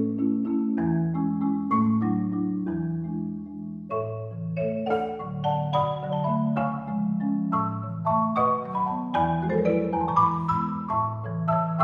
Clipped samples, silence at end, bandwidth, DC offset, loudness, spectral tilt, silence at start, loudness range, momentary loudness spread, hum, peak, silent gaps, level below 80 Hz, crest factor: under 0.1%; 0 s; 6.6 kHz; under 0.1%; -26 LUFS; -10 dB/octave; 0 s; 4 LU; 8 LU; none; -8 dBFS; none; -56 dBFS; 16 dB